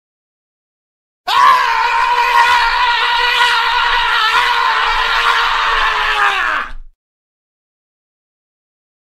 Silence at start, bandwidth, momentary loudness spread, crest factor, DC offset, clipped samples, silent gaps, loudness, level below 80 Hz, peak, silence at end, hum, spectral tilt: 1.25 s; 15.5 kHz; 4 LU; 16 dB; under 0.1%; under 0.1%; none; -12 LUFS; -36 dBFS; 0 dBFS; 2.2 s; none; 0.5 dB/octave